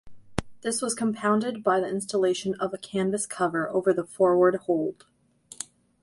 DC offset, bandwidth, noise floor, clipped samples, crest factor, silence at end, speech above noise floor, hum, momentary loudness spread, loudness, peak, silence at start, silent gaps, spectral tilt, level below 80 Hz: under 0.1%; 11.5 kHz; -52 dBFS; under 0.1%; 20 dB; 0.4 s; 27 dB; none; 13 LU; -26 LUFS; -6 dBFS; 0.05 s; none; -4.5 dB/octave; -56 dBFS